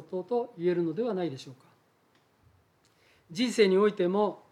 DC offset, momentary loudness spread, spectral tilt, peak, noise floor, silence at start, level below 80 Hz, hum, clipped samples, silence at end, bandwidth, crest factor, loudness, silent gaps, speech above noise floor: under 0.1%; 15 LU; -6 dB/octave; -10 dBFS; -67 dBFS; 0 s; -80 dBFS; none; under 0.1%; 0.15 s; 12.5 kHz; 20 dB; -28 LUFS; none; 39 dB